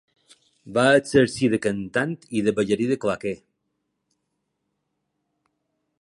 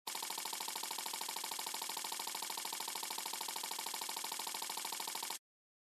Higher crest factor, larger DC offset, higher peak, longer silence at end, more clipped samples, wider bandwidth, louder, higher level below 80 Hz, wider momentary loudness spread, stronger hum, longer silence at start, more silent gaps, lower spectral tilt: about the same, 20 dB vs 20 dB; neither; first, -4 dBFS vs -24 dBFS; first, 2.65 s vs 0.45 s; neither; second, 11.5 kHz vs 14 kHz; first, -22 LUFS vs -41 LUFS; first, -58 dBFS vs under -90 dBFS; first, 10 LU vs 0 LU; neither; first, 0.65 s vs 0.05 s; neither; first, -5.5 dB/octave vs 1.5 dB/octave